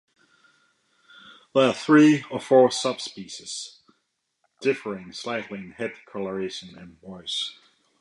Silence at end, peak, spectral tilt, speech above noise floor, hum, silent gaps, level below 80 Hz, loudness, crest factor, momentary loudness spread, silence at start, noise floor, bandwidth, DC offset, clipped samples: 0.5 s; -6 dBFS; -4.5 dB/octave; 52 dB; none; none; -70 dBFS; -24 LUFS; 20 dB; 20 LU; 1.55 s; -75 dBFS; 11.5 kHz; under 0.1%; under 0.1%